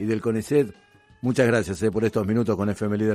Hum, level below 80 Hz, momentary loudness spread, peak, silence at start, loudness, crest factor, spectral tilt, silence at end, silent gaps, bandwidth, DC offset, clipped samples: none; -56 dBFS; 5 LU; -6 dBFS; 0 s; -24 LUFS; 16 dB; -7 dB/octave; 0 s; none; 14 kHz; under 0.1%; under 0.1%